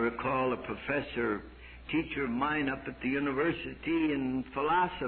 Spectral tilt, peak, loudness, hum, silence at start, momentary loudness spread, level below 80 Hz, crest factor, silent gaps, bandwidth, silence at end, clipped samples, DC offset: -9.5 dB/octave; -18 dBFS; -32 LUFS; none; 0 s; 6 LU; -54 dBFS; 14 dB; none; 4.5 kHz; 0 s; under 0.1%; under 0.1%